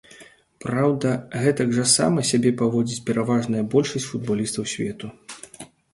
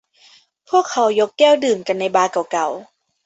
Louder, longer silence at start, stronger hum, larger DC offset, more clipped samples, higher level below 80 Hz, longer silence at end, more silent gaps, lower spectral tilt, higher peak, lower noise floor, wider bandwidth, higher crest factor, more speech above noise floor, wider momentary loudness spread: second, -22 LUFS vs -17 LUFS; second, 0.1 s vs 0.7 s; neither; neither; neither; first, -58 dBFS vs -68 dBFS; about the same, 0.3 s vs 0.4 s; neither; first, -4.5 dB/octave vs -3 dB/octave; about the same, -4 dBFS vs -2 dBFS; about the same, -49 dBFS vs -51 dBFS; first, 11.5 kHz vs 8.2 kHz; about the same, 18 dB vs 16 dB; second, 27 dB vs 35 dB; first, 19 LU vs 8 LU